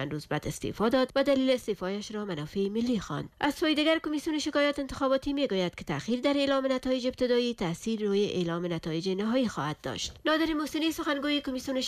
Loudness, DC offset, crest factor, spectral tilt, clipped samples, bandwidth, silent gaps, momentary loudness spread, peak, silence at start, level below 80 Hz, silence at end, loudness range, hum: -29 LUFS; under 0.1%; 14 dB; -5 dB/octave; under 0.1%; 15.5 kHz; none; 8 LU; -16 dBFS; 0 s; -54 dBFS; 0 s; 2 LU; none